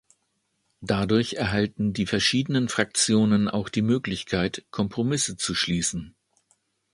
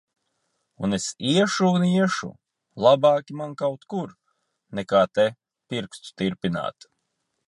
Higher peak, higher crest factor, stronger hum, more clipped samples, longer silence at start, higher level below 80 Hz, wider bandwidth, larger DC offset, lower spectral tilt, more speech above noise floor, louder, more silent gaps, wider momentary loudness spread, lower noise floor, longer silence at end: about the same, -4 dBFS vs -4 dBFS; about the same, 20 dB vs 20 dB; neither; neither; about the same, 0.8 s vs 0.8 s; first, -50 dBFS vs -62 dBFS; about the same, 11.5 kHz vs 11.5 kHz; neither; second, -4 dB/octave vs -5.5 dB/octave; second, 50 dB vs 54 dB; about the same, -24 LUFS vs -23 LUFS; neither; second, 7 LU vs 14 LU; about the same, -74 dBFS vs -77 dBFS; about the same, 0.85 s vs 0.75 s